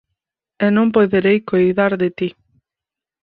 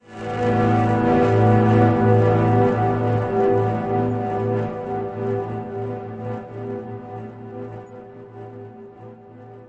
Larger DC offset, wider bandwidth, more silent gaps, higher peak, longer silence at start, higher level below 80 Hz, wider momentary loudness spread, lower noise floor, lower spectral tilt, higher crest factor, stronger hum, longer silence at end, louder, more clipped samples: neither; second, 4.8 kHz vs 7.4 kHz; neither; about the same, -2 dBFS vs -4 dBFS; first, 0.6 s vs 0.1 s; second, -56 dBFS vs -46 dBFS; second, 7 LU vs 22 LU; first, -87 dBFS vs -42 dBFS; about the same, -10 dB/octave vs -9.5 dB/octave; about the same, 16 dB vs 16 dB; neither; first, 0.95 s vs 0 s; first, -16 LUFS vs -20 LUFS; neither